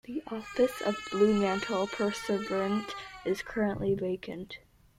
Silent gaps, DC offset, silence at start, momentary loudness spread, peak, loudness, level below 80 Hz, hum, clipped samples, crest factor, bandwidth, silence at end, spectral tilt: none; under 0.1%; 0.1 s; 13 LU; -14 dBFS; -31 LUFS; -58 dBFS; none; under 0.1%; 18 dB; 15 kHz; 0.4 s; -5.5 dB/octave